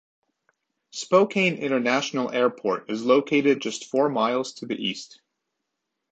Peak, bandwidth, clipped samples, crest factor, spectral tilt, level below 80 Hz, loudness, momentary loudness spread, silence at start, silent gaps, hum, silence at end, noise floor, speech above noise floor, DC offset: -6 dBFS; 8.8 kHz; under 0.1%; 20 dB; -4.5 dB/octave; -74 dBFS; -23 LUFS; 9 LU; 0.95 s; none; none; 1.05 s; -81 dBFS; 58 dB; under 0.1%